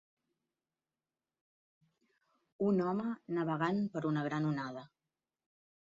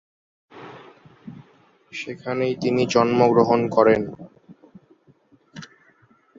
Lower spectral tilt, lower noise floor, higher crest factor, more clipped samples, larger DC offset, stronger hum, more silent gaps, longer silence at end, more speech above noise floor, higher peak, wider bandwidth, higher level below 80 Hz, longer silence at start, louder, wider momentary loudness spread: about the same, -7 dB/octave vs -6.5 dB/octave; first, under -90 dBFS vs -58 dBFS; about the same, 20 dB vs 22 dB; neither; neither; neither; neither; first, 1 s vs 0.75 s; first, over 55 dB vs 39 dB; second, -20 dBFS vs -2 dBFS; about the same, 7.4 kHz vs 7.8 kHz; second, -80 dBFS vs -60 dBFS; first, 2.6 s vs 0.55 s; second, -35 LUFS vs -20 LUFS; second, 7 LU vs 26 LU